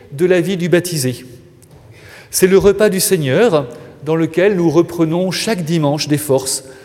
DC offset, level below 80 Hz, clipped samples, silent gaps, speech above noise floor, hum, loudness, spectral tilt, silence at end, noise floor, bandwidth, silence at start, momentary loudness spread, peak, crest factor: under 0.1%; -46 dBFS; under 0.1%; none; 28 dB; none; -14 LUFS; -5 dB/octave; 0 s; -42 dBFS; 16.5 kHz; 0.1 s; 8 LU; 0 dBFS; 14 dB